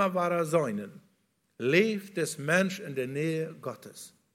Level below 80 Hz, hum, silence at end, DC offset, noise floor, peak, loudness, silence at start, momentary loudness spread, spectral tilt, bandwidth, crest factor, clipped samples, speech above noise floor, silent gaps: -76 dBFS; none; 0.25 s; under 0.1%; -73 dBFS; -10 dBFS; -29 LUFS; 0 s; 17 LU; -5 dB/octave; 16.5 kHz; 20 dB; under 0.1%; 43 dB; none